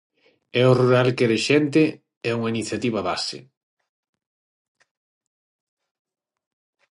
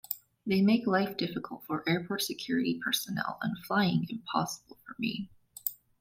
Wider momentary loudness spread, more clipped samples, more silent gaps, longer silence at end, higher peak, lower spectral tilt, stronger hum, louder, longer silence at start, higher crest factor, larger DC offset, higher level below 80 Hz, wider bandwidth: about the same, 10 LU vs 11 LU; neither; first, 2.17-2.21 s vs none; first, 3.5 s vs 0.25 s; first, -4 dBFS vs -10 dBFS; about the same, -6 dB/octave vs -5 dB/octave; neither; first, -21 LUFS vs -31 LUFS; first, 0.55 s vs 0.1 s; about the same, 20 dB vs 20 dB; neither; about the same, -64 dBFS vs -68 dBFS; second, 11.5 kHz vs 16.5 kHz